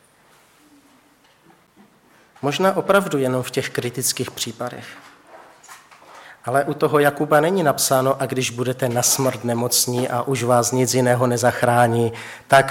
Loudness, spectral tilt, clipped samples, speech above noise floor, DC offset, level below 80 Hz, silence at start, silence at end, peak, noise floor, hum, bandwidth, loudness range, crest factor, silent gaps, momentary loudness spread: -19 LUFS; -4 dB/octave; under 0.1%; 36 dB; under 0.1%; -64 dBFS; 2.45 s; 0 s; -2 dBFS; -55 dBFS; none; 17.5 kHz; 7 LU; 18 dB; none; 9 LU